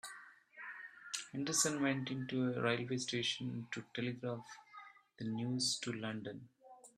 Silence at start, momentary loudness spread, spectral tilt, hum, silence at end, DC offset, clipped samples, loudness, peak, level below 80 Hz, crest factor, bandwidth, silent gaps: 0.05 s; 20 LU; -3.5 dB/octave; none; 0.1 s; under 0.1%; under 0.1%; -39 LUFS; -18 dBFS; -78 dBFS; 22 dB; 13.5 kHz; none